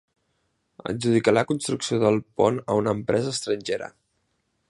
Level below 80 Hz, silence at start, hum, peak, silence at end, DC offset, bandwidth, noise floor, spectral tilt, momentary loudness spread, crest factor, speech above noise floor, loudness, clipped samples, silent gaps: -60 dBFS; 0.85 s; none; -6 dBFS; 0.8 s; under 0.1%; 11.5 kHz; -73 dBFS; -5 dB/octave; 10 LU; 20 dB; 49 dB; -24 LUFS; under 0.1%; none